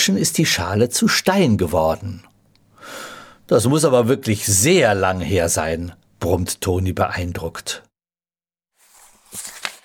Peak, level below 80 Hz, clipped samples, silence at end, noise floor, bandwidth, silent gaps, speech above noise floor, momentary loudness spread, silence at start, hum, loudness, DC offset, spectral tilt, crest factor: -2 dBFS; -44 dBFS; under 0.1%; 0.1 s; under -90 dBFS; 19.5 kHz; none; over 72 dB; 18 LU; 0 s; none; -18 LUFS; under 0.1%; -4 dB/octave; 18 dB